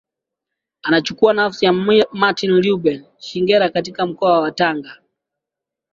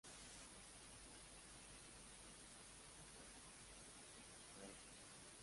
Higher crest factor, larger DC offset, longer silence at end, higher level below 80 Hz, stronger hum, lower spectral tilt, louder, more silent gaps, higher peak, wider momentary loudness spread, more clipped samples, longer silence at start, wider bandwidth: about the same, 16 dB vs 18 dB; neither; first, 1 s vs 0 s; first, -60 dBFS vs -72 dBFS; neither; first, -5.5 dB/octave vs -2 dB/octave; first, -16 LUFS vs -59 LUFS; neither; first, -2 dBFS vs -44 dBFS; first, 8 LU vs 2 LU; neither; first, 0.85 s vs 0.05 s; second, 7.6 kHz vs 11.5 kHz